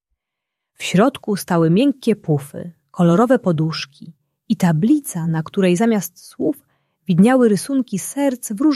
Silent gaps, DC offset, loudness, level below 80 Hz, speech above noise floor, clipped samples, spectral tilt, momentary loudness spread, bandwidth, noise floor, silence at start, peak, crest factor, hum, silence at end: none; under 0.1%; -18 LUFS; -62 dBFS; 64 dB; under 0.1%; -6.5 dB/octave; 13 LU; 14.5 kHz; -81 dBFS; 0.8 s; -2 dBFS; 16 dB; none; 0 s